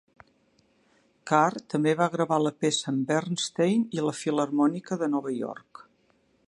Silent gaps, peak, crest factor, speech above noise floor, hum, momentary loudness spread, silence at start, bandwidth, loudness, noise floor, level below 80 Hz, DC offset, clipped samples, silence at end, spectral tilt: none; -6 dBFS; 22 dB; 41 dB; none; 7 LU; 1.25 s; 11.5 kHz; -26 LUFS; -67 dBFS; -74 dBFS; under 0.1%; under 0.1%; 0.95 s; -5 dB/octave